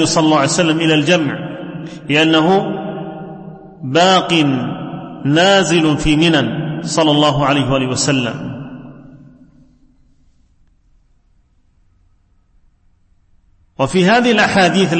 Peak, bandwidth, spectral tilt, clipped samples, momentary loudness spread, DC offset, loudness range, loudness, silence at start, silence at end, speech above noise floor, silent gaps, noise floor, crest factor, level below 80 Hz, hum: 0 dBFS; 8.8 kHz; -4.5 dB/octave; under 0.1%; 17 LU; under 0.1%; 9 LU; -14 LUFS; 0 s; 0 s; 41 dB; none; -54 dBFS; 16 dB; -42 dBFS; none